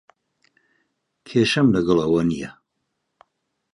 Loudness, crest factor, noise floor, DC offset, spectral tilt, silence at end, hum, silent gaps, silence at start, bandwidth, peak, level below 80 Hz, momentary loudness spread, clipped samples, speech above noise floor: -20 LUFS; 20 dB; -76 dBFS; under 0.1%; -6 dB/octave; 1.2 s; none; none; 1.25 s; 11 kHz; -4 dBFS; -52 dBFS; 11 LU; under 0.1%; 58 dB